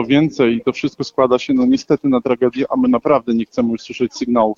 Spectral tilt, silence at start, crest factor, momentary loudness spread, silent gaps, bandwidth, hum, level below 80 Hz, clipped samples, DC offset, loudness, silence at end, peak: -6.5 dB/octave; 0 s; 14 dB; 6 LU; none; 7.4 kHz; none; -52 dBFS; under 0.1%; under 0.1%; -17 LUFS; 0.05 s; -2 dBFS